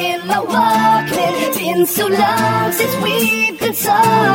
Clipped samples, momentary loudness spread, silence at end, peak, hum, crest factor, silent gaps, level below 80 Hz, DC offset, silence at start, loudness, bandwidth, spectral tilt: under 0.1%; 5 LU; 0 s; -2 dBFS; none; 14 dB; none; -54 dBFS; under 0.1%; 0 s; -14 LUFS; 17 kHz; -4 dB/octave